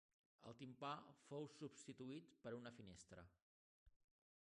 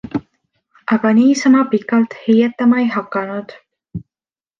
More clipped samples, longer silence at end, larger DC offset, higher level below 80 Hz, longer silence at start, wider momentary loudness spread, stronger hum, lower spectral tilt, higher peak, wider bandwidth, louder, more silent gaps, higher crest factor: neither; about the same, 0.55 s vs 0.6 s; neither; second, -82 dBFS vs -56 dBFS; first, 0.4 s vs 0.05 s; second, 12 LU vs 19 LU; neither; about the same, -5 dB/octave vs -6 dB/octave; second, -36 dBFS vs -2 dBFS; first, 10 kHz vs 7.4 kHz; second, -57 LUFS vs -15 LUFS; first, 3.42-3.86 s vs none; first, 22 dB vs 14 dB